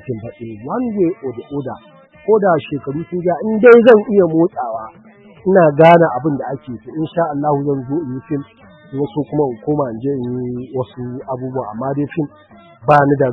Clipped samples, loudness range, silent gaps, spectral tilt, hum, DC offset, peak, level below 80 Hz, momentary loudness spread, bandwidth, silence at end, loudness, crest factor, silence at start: under 0.1%; 10 LU; none; -9.5 dB/octave; none; under 0.1%; 0 dBFS; -52 dBFS; 18 LU; 5.6 kHz; 0 s; -15 LUFS; 16 dB; 0.05 s